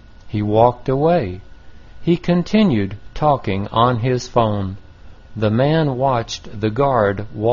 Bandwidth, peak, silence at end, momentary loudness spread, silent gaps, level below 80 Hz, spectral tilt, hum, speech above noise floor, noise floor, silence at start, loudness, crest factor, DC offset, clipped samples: 7.2 kHz; 0 dBFS; 0 s; 12 LU; none; -40 dBFS; -6.5 dB/octave; none; 22 dB; -39 dBFS; 0.25 s; -18 LUFS; 18 dB; 0.6%; under 0.1%